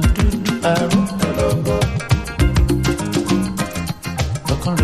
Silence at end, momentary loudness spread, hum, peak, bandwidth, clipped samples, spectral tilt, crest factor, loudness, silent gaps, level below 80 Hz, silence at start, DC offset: 0 s; 6 LU; none; -2 dBFS; 15 kHz; under 0.1%; -5.5 dB/octave; 16 dB; -19 LUFS; none; -24 dBFS; 0 s; under 0.1%